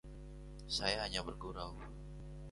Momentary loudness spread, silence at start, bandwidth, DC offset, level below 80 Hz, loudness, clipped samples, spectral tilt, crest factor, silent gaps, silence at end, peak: 17 LU; 0.05 s; 11.5 kHz; under 0.1%; -52 dBFS; -40 LUFS; under 0.1%; -3.5 dB/octave; 26 dB; none; 0 s; -18 dBFS